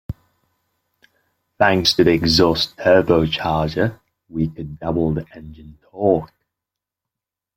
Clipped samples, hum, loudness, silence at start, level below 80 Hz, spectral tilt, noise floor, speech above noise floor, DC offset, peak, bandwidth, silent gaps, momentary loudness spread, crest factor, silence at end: under 0.1%; none; -18 LUFS; 0.1 s; -44 dBFS; -5.5 dB/octave; -86 dBFS; 68 dB; under 0.1%; 0 dBFS; 16.5 kHz; none; 15 LU; 20 dB; 1.3 s